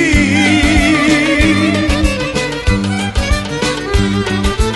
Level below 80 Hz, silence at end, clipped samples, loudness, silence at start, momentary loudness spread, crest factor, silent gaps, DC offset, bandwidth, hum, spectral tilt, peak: -20 dBFS; 0 s; under 0.1%; -13 LUFS; 0 s; 6 LU; 12 dB; none; under 0.1%; 12 kHz; none; -5 dB/octave; 0 dBFS